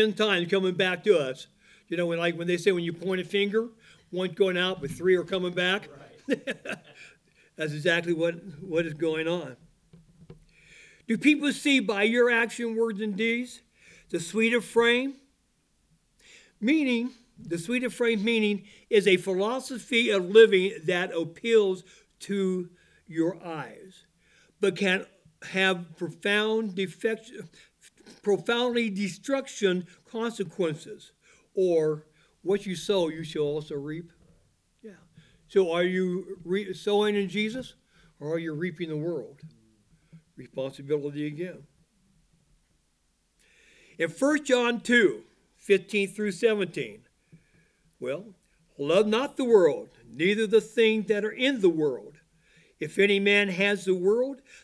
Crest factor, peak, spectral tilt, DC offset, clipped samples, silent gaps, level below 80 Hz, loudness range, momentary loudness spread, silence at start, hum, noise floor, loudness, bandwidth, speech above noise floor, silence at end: 22 dB; -6 dBFS; -5 dB/octave; under 0.1%; under 0.1%; none; -68 dBFS; 8 LU; 15 LU; 0 s; none; -71 dBFS; -26 LUFS; 11 kHz; 45 dB; 0.25 s